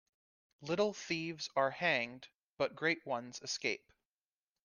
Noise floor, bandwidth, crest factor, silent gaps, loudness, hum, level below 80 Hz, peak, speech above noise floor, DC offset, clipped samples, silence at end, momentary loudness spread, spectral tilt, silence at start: under -90 dBFS; 10.5 kHz; 20 dB; 2.34-2.57 s; -36 LUFS; none; -80 dBFS; -18 dBFS; over 53 dB; under 0.1%; under 0.1%; 0.85 s; 10 LU; -3.5 dB/octave; 0.6 s